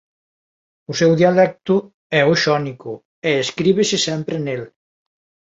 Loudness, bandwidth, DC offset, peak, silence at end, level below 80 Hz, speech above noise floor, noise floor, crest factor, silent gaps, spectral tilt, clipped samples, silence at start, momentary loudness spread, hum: -18 LUFS; 8 kHz; under 0.1%; -2 dBFS; 0.9 s; -60 dBFS; over 73 dB; under -90 dBFS; 16 dB; 1.94-2.10 s, 3.05-3.22 s; -5 dB/octave; under 0.1%; 0.9 s; 13 LU; none